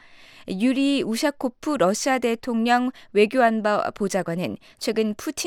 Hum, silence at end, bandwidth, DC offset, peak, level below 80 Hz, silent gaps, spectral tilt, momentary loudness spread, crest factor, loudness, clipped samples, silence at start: none; 0 s; 17 kHz; under 0.1%; -6 dBFS; -60 dBFS; none; -4.5 dB/octave; 9 LU; 16 dB; -23 LUFS; under 0.1%; 0.15 s